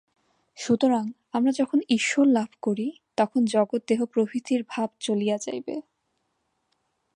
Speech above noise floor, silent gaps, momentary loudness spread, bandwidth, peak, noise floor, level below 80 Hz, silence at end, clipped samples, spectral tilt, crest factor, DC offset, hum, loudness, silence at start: 51 dB; none; 9 LU; 10.5 kHz; -8 dBFS; -75 dBFS; -74 dBFS; 1.35 s; under 0.1%; -4.5 dB/octave; 16 dB; under 0.1%; none; -25 LUFS; 0.55 s